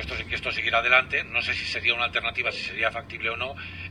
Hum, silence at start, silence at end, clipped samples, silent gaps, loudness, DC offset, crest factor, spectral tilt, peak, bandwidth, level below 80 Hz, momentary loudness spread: none; 0 s; 0 s; under 0.1%; none; -24 LUFS; under 0.1%; 22 dB; -3.5 dB/octave; -4 dBFS; 12 kHz; -48 dBFS; 10 LU